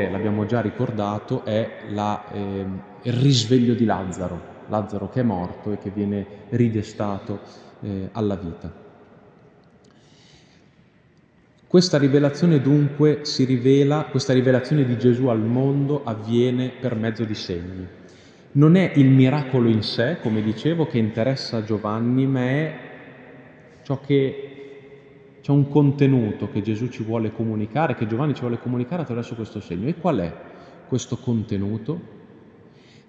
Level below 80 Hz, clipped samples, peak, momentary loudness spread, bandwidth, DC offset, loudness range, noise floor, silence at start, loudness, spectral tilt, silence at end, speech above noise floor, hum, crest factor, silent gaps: -56 dBFS; under 0.1%; -2 dBFS; 13 LU; 8.4 kHz; under 0.1%; 8 LU; -56 dBFS; 0 s; -22 LUFS; -7 dB/octave; 0.85 s; 35 dB; none; 20 dB; none